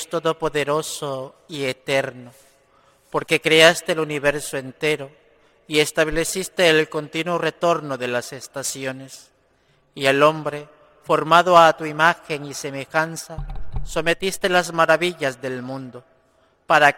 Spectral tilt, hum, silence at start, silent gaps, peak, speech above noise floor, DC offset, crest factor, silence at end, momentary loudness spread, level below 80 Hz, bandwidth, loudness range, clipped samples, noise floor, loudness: -3.5 dB/octave; none; 0 s; none; 0 dBFS; 40 dB; under 0.1%; 20 dB; 0 s; 18 LU; -44 dBFS; 16.5 kHz; 6 LU; under 0.1%; -61 dBFS; -20 LUFS